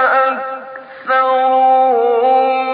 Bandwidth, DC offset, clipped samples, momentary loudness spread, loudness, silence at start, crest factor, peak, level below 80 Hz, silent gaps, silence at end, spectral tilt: 5 kHz; under 0.1%; under 0.1%; 16 LU; -13 LUFS; 0 s; 10 dB; -4 dBFS; -72 dBFS; none; 0 s; -8 dB/octave